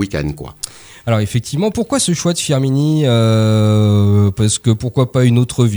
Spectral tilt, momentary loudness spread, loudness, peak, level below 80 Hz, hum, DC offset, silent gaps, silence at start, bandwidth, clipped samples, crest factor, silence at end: -6 dB/octave; 11 LU; -14 LUFS; -2 dBFS; -40 dBFS; none; under 0.1%; none; 0 s; over 20 kHz; under 0.1%; 12 dB; 0 s